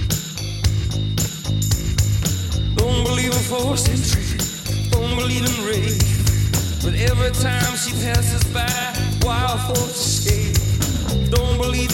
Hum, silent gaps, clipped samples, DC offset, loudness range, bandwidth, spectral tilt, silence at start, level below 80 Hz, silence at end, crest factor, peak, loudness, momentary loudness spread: none; none; under 0.1%; under 0.1%; 1 LU; 17 kHz; -4 dB/octave; 0 s; -26 dBFS; 0 s; 14 dB; -6 dBFS; -20 LUFS; 4 LU